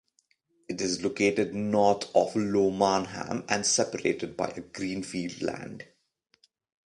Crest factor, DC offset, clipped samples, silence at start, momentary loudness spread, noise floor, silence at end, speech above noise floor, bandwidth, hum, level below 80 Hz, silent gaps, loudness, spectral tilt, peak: 22 dB; under 0.1%; under 0.1%; 0.7 s; 10 LU; -71 dBFS; 1.05 s; 43 dB; 11.5 kHz; none; -62 dBFS; none; -28 LUFS; -3.5 dB/octave; -8 dBFS